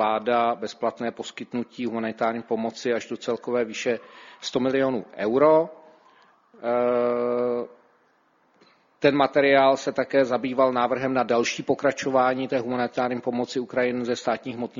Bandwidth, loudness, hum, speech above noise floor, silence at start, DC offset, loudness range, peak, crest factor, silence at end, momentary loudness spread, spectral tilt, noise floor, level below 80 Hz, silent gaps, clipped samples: 7.6 kHz; -24 LUFS; none; 40 dB; 0 s; under 0.1%; 6 LU; -4 dBFS; 20 dB; 0 s; 11 LU; -5 dB/octave; -64 dBFS; -68 dBFS; none; under 0.1%